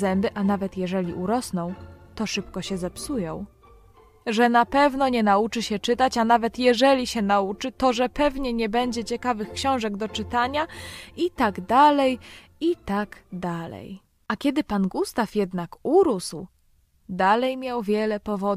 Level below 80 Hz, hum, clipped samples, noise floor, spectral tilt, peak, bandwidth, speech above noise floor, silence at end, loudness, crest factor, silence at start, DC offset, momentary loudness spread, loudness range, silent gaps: -48 dBFS; none; under 0.1%; -62 dBFS; -5 dB/octave; -6 dBFS; 15 kHz; 38 dB; 0 s; -24 LUFS; 18 dB; 0 s; under 0.1%; 14 LU; 7 LU; none